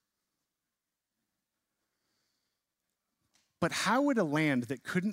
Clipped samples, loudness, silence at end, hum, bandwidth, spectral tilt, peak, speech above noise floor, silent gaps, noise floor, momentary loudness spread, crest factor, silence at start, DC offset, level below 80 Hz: under 0.1%; -30 LUFS; 0 s; none; 16 kHz; -5 dB/octave; -16 dBFS; 59 dB; none; -89 dBFS; 6 LU; 20 dB; 3.6 s; under 0.1%; -76 dBFS